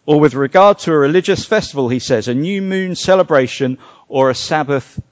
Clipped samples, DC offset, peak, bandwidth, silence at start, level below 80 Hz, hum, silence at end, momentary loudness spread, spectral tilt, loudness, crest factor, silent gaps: under 0.1%; under 0.1%; 0 dBFS; 8 kHz; 0.05 s; -48 dBFS; none; 0.1 s; 9 LU; -5.5 dB/octave; -14 LUFS; 14 dB; none